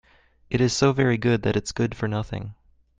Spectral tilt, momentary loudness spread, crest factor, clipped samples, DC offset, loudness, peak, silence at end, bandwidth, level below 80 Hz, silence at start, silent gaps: -5.5 dB/octave; 12 LU; 20 dB; under 0.1%; under 0.1%; -23 LUFS; -4 dBFS; 0.45 s; 9.6 kHz; -48 dBFS; 0.5 s; none